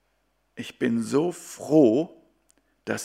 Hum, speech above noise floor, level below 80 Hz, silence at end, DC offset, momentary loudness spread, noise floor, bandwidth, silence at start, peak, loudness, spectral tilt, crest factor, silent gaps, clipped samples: none; 48 dB; -72 dBFS; 0 s; under 0.1%; 20 LU; -71 dBFS; 15 kHz; 0.55 s; -6 dBFS; -23 LUFS; -6 dB/octave; 18 dB; none; under 0.1%